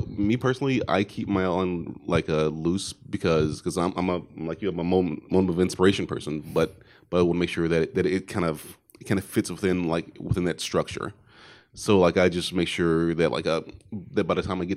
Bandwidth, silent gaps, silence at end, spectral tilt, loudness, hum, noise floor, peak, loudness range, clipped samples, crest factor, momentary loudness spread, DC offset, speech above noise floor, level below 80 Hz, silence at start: 15.5 kHz; none; 0 s; -6 dB/octave; -25 LUFS; none; -52 dBFS; -6 dBFS; 2 LU; under 0.1%; 18 dB; 8 LU; under 0.1%; 27 dB; -52 dBFS; 0 s